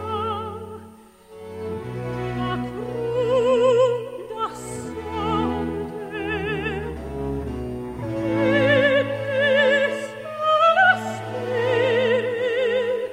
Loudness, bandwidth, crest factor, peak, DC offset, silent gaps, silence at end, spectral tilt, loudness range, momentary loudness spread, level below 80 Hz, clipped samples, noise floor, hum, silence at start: -22 LUFS; 14.5 kHz; 16 dB; -6 dBFS; under 0.1%; none; 0 s; -5.5 dB/octave; 8 LU; 14 LU; -44 dBFS; under 0.1%; -46 dBFS; none; 0 s